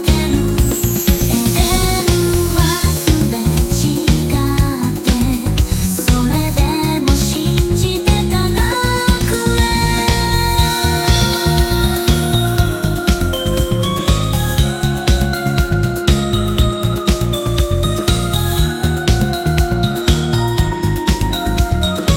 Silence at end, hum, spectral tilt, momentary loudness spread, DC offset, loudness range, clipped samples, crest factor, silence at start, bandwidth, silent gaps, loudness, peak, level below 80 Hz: 0 s; none; -5 dB/octave; 3 LU; under 0.1%; 2 LU; under 0.1%; 14 dB; 0 s; 17 kHz; none; -15 LUFS; 0 dBFS; -20 dBFS